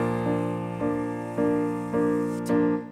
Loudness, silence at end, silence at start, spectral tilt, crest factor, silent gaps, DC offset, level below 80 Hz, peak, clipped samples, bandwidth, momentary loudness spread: -26 LUFS; 0 s; 0 s; -8 dB/octave; 12 dB; none; under 0.1%; -56 dBFS; -14 dBFS; under 0.1%; 12.5 kHz; 5 LU